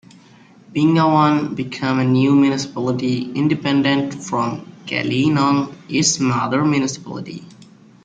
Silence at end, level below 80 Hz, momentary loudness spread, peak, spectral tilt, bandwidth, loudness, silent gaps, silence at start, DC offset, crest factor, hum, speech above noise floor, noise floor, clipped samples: 0.4 s; -58 dBFS; 11 LU; -2 dBFS; -5 dB/octave; 9.2 kHz; -18 LUFS; none; 0.7 s; under 0.1%; 16 dB; none; 29 dB; -47 dBFS; under 0.1%